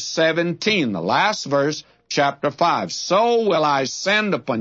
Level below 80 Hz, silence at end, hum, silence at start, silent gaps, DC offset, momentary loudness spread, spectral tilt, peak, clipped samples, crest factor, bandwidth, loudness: -68 dBFS; 0 s; none; 0 s; none; under 0.1%; 5 LU; -4 dB/octave; -4 dBFS; under 0.1%; 16 dB; 7.8 kHz; -19 LUFS